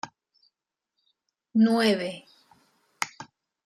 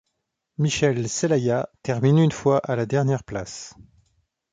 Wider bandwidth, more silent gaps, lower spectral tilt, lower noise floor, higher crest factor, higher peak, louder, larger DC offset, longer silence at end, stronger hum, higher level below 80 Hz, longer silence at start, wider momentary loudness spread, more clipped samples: first, 13 kHz vs 9.4 kHz; neither; about the same, -5 dB/octave vs -6 dB/octave; first, -84 dBFS vs -78 dBFS; first, 22 dB vs 16 dB; about the same, -8 dBFS vs -8 dBFS; second, -25 LUFS vs -22 LUFS; neither; second, 0.4 s vs 0.7 s; neither; second, -76 dBFS vs -54 dBFS; second, 0.05 s vs 0.6 s; first, 24 LU vs 15 LU; neither